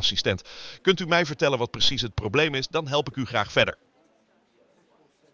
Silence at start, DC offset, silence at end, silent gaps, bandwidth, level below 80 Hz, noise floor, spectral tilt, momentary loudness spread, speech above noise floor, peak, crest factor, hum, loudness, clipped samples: 0 s; under 0.1%; 1.6 s; none; 7.6 kHz; -50 dBFS; -64 dBFS; -4 dB/octave; 6 LU; 39 dB; -8 dBFS; 18 dB; none; -24 LUFS; under 0.1%